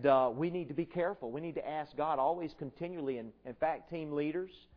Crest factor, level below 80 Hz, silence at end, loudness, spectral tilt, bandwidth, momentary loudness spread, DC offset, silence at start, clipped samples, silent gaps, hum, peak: 20 dB; -68 dBFS; 0.2 s; -36 LUFS; -9.5 dB/octave; 5.4 kHz; 9 LU; under 0.1%; 0 s; under 0.1%; none; none; -16 dBFS